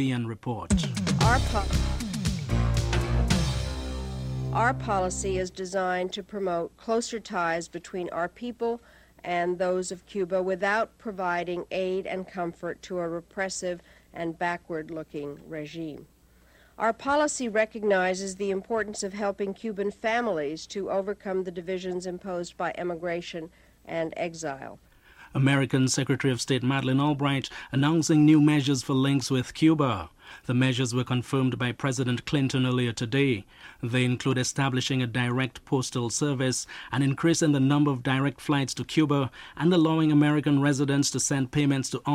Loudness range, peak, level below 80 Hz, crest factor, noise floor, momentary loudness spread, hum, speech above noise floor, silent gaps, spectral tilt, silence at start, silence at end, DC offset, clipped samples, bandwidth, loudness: 9 LU; -8 dBFS; -40 dBFS; 18 dB; -58 dBFS; 11 LU; none; 32 dB; none; -5.5 dB/octave; 0 s; 0 s; under 0.1%; under 0.1%; 15 kHz; -27 LUFS